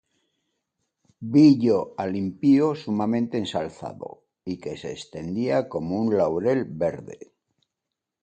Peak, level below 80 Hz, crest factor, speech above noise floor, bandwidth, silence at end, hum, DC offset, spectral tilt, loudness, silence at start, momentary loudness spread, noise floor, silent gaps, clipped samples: -6 dBFS; -58 dBFS; 18 dB; 62 dB; 8.8 kHz; 1.05 s; none; under 0.1%; -7.5 dB/octave; -23 LUFS; 1.2 s; 19 LU; -85 dBFS; none; under 0.1%